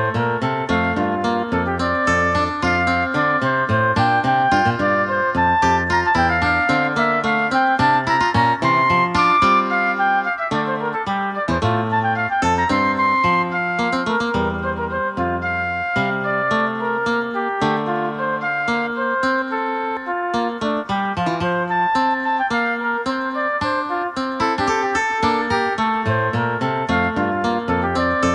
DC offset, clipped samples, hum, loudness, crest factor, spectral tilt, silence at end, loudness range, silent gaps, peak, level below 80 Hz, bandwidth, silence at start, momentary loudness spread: under 0.1%; under 0.1%; none; -19 LUFS; 14 dB; -5.5 dB/octave; 0 s; 4 LU; none; -4 dBFS; -44 dBFS; 11 kHz; 0 s; 6 LU